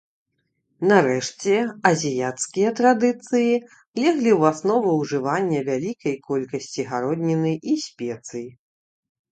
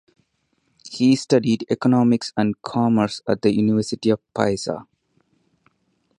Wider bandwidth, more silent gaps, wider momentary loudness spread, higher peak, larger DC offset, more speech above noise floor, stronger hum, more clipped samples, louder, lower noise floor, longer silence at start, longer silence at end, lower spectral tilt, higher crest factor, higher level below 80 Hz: second, 9.2 kHz vs 10.5 kHz; first, 3.87-3.94 s vs none; first, 12 LU vs 6 LU; about the same, 0 dBFS vs -2 dBFS; neither; first, 53 dB vs 49 dB; neither; neither; about the same, -22 LUFS vs -20 LUFS; first, -74 dBFS vs -69 dBFS; about the same, 0.8 s vs 0.85 s; second, 0.85 s vs 1.35 s; about the same, -5.5 dB/octave vs -6.5 dB/octave; about the same, 22 dB vs 20 dB; second, -68 dBFS vs -58 dBFS